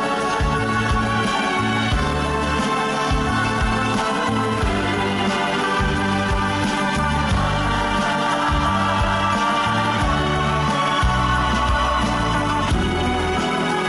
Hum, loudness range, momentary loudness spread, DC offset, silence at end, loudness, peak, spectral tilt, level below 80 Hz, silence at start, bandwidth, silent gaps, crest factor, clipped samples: none; 1 LU; 2 LU; under 0.1%; 0 s; -20 LUFS; -8 dBFS; -5 dB/octave; -28 dBFS; 0 s; 12.5 kHz; none; 12 dB; under 0.1%